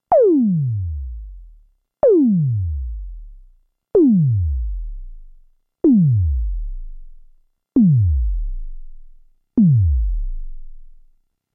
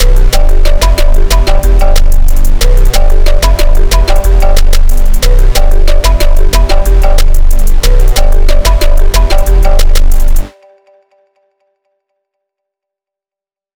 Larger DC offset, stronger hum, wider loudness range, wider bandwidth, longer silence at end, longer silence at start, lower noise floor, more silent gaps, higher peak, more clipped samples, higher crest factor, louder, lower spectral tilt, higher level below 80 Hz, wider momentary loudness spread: neither; neither; about the same, 3 LU vs 5 LU; second, 2.2 kHz vs 16.5 kHz; second, 0.65 s vs 3.3 s; about the same, 0.1 s vs 0 s; second, -56 dBFS vs -89 dBFS; neither; second, -6 dBFS vs 0 dBFS; second, under 0.1% vs 20%; first, 12 dB vs 4 dB; second, -18 LUFS vs -11 LUFS; first, -15 dB/octave vs -4 dB/octave; second, -26 dBFS vs -4 dBFS; first, 21 LU vs 2 LU